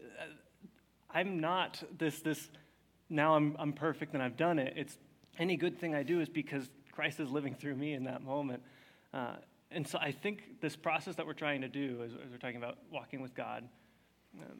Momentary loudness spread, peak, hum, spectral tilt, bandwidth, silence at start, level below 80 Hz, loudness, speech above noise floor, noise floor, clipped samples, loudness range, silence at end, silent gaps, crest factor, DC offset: 14 LU; -16 dBFS; none; -5.5 dB/octave; 17.5 kHz; 0 s; -82 dBFS; -38 LUFS; 32 dB; -69 dBFS; under 0.1%; 5 LU; 0 s; none; 22 dB; under 0.1%